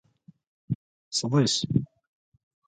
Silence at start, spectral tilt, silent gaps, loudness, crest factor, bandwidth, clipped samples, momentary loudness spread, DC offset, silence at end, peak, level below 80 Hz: 0.7 s; -5 dB/octave; 0.75-1.11 s; -27 LUFS; 20 dB; 9.4 kHz; under 0.1%; 12 LU; under 0.1%; 0.85 s; -10 dBFS; -58 dBFS